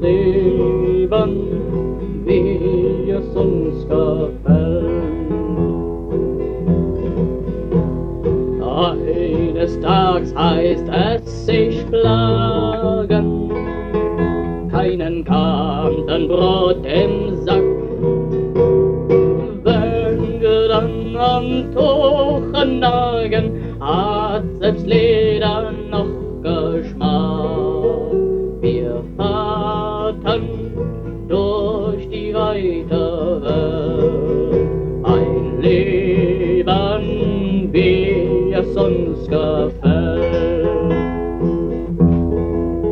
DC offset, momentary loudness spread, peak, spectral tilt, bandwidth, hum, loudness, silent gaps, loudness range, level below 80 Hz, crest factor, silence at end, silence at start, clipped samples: under 0.1%; 7 LU; -2 dBFS; -9 dB/octave; 6.2 kHz; none; -17 LUFS; none; 4 LU; -30 dBFS; 14 dB; 0 s; 0 s; under 0.1%